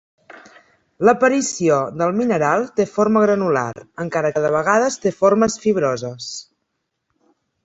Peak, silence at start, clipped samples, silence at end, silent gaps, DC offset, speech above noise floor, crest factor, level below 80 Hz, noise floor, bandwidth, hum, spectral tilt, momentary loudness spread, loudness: -2 dBFS; 0.35 s; under 0.1%; 1.2 s; none; under 0.1%; 57 dB; 18 dB; -58 dBFS; -75 dBFS; 8.2 kHz; none; -5 dB/octave; 11 LU; -18 LUFS